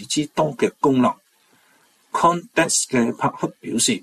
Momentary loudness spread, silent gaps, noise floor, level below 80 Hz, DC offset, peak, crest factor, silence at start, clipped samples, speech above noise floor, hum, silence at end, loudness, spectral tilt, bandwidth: 8 LU; none; -59 dBFS; -60 dBFS; under 0.1%; -4 dBFS; 18 dB; 0 s; under 0.1%; 39 dB; none; 0.05 s; -20 LUFS; -3.5 dB/octave; 14 kHz